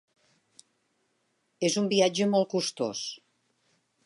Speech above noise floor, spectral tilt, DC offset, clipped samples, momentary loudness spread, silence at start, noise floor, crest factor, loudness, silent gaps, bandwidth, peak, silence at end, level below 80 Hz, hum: 48 dB; -4 dB/octave; under 0.1%; under 0.1%; 12 LU; 1.6 s; -74 dBFS; 20 dB; -27 LUFS; none; 11.5 kHz; -10 dBFS; 0.9 s; -80 dBFS; none